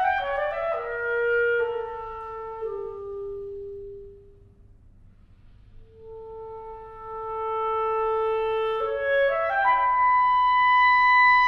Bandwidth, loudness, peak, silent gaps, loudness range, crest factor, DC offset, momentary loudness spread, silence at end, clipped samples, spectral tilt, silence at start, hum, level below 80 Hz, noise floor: 6.4 kHz; -23 LUFS; -12 dBFS; none; 21 LU; 14 dB; under 0.1%; 22 LU; 0 s; under 0.1%; -4 dB/octave; 0 s; none; -52 dBFS; -52 dBFS